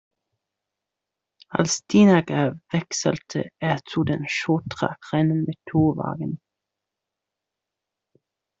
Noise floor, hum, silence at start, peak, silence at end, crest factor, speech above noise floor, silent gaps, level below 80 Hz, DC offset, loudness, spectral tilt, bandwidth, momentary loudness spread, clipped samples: -85 dBFS; none; 1.5 s; -4 dBFS; 2.25 s; 20 dB; 63 dB; none; -60 dBFS; under 0.1%; -23 LUFS; -5.5 dB/octave; 8 kHz; 12 LU; under 0.1%